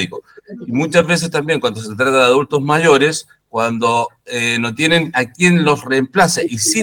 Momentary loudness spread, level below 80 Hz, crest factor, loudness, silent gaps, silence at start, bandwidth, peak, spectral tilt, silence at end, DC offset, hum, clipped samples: 10 LU; -54 dBFS; 16 dB; -15 LUFS; none; 0 s; 19.5 kHz; 0 dBFS; -4 dB/octave; 0 s; under 0.1%; none; under 0.1%